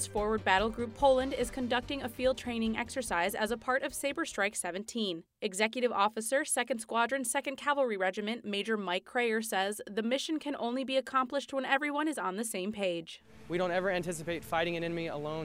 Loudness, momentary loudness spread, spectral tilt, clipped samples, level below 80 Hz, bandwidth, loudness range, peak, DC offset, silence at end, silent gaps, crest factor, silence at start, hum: -32 LUFS; 6 LU; -3.5 dB/octave; under 0.1%; -56 dBFS; 16 kHz; 2 LU; -10 dBFS; under 0.1%; 0 s; none; 22 dB; 0 s; none